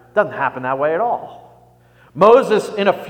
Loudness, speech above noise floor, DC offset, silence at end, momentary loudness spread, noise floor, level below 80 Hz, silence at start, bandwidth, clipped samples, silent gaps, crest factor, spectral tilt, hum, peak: -16 LUFS; 34 dB; under 0.1%; 0 s; 14 LU; -50 dBFS; -60 dBFS; 0.15 s; 16 kHz; under 0.1%; none; 18 dB; -5.5 dB/octave; 60 Hz at -50 dBFS; 0 dBFS